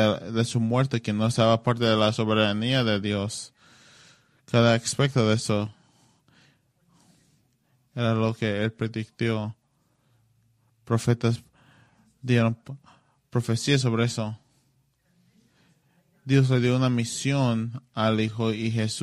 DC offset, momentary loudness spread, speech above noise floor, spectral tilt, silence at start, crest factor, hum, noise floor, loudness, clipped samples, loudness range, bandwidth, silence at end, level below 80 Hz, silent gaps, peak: under 0.1%; 12 LU; 45 dB; -5.5 dB/octave; 0 s; 20 dB; none; -68 dBFS; -25 LUFS; under 0.1%; 6 LU; 12 kHz; 0 s; -60 dBFS; none; -6 dBFS